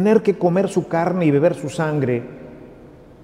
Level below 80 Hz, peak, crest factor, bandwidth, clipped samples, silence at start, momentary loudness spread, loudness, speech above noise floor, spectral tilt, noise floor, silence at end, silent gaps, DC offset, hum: -54 dBFS; -4 dBFS; 16 dB; 12.5 kHz; under 0.1%; 0 s; 16 LU; -19 LUFS; 25 dB; -7.5 dB/octave; -43 dBFS; 0.3 s; none; under 0.1%; none